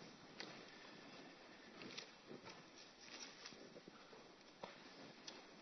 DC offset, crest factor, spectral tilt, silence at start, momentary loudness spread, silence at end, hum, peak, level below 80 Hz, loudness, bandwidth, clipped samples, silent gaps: under 0.1%; 26 dB; -1.5 dB/octave; 0 s; 7 LU; 0 s; none; -34 dBFS; -88 dBFS; -57 LUFS; 6.2 kHz; under 0.1%; none